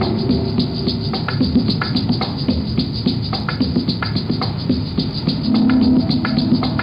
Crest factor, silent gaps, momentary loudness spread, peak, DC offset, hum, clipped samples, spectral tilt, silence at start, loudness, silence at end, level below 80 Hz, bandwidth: 14 dB; none; 6 LU; -4 dBFS; under 0.1%; none; under 0.1%; -8.5 dB/octave; 0 s; -18 LUFS; 0 s; -34 dBFS; 5.6 kHz